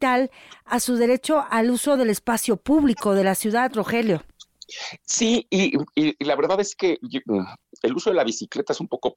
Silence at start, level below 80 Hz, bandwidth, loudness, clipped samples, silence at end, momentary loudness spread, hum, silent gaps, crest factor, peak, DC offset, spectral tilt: 0 s; -56 dBFS; 17 kHz; -22 LUFS; under 0.1%; 0.05 s; 8 LU; none; none; 12 dB; -10 dBFS; under 0.1%; -4 dB/octave